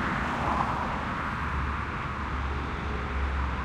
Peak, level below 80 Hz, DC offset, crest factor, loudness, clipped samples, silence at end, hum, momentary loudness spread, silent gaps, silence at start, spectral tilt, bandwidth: -12 dBFS; -36 dBFS; under 0.1%; 18 dB; -30 LUFS; under 0.1%; 0 s; none; 5 LU; none; 0 s; -6.5 dB/octave; 9.8 kHz